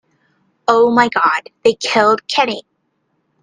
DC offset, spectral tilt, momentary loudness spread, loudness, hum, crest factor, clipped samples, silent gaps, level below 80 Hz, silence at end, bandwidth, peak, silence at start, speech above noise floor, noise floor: under 0.1%; -3.5 dB/octave; 7 LU; -14 LUFS; none; 16 dB; under 0.1%; none; -60 dBFS; 0.8 s; 9.6 kHz; 0 dBFS; 0.7 s; 52 dB; -66 dBFS